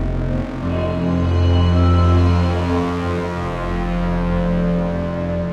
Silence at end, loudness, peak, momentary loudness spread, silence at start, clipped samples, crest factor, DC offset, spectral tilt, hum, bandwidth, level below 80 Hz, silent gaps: 0 s; -19 LUFS; -4 dBFS; 8 LU; 0 s; under 0.1%; 12 dB; under 0.1%; -8.5 dB/octave; none; 7 kHz; -26 dBFS; none